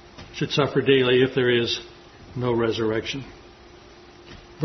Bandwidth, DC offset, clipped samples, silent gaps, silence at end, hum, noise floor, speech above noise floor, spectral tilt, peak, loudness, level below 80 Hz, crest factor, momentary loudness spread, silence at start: 6.4 kHz; under 0.1%; under 0.1%; none; 0 s; none; -47 dBFS; 25 dB; -5.5 dB/octave; -4 dBFS; -22 LUFS; -54 dBFS; 20 dB; 19 LU; 0.2 s